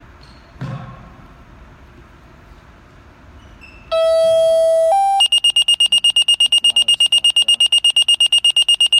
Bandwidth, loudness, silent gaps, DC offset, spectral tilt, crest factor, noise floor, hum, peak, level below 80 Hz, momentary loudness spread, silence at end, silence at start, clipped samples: 15 kHz; -11 LUFS; none; under 0.1%; 0 dB/octave; 10 dB; -44 dBFS; none; -6 dBFS; -48 dBFS; 10 LU; 0 s; 0.6 s; under 0.1%